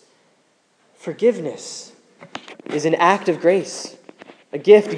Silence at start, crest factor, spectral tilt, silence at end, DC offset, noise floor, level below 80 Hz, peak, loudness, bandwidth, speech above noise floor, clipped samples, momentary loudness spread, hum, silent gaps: 1.05 s; 20 dB; -4.5 dB/octave; 0 s; under 0.1%; -61 dBFS; -80 dBFS; 0 dBFS; -18 LUFS; 10.5 kHz; 44 dB; under 0.1%; 20 LU; none; none